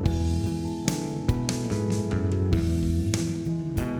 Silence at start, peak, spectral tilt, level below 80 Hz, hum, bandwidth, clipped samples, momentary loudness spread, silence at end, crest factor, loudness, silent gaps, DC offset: 0 s; -6 dBFS; -6.5 dB/octave; -36 dBFS; none; 19 kHz; under 0.1%; 4 LU; 0 s; 18 dB; -27 LUFS; none; under 0.1%